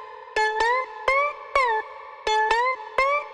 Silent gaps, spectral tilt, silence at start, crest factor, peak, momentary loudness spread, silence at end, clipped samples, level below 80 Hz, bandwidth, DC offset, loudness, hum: none; -1 dB/octave; 0 s; 18 dB; -6 dBFS; 7 LU; 0 s; under 0.1%; -52 dBFS; 11 kHz; under 0.1%; -23 LUFS; none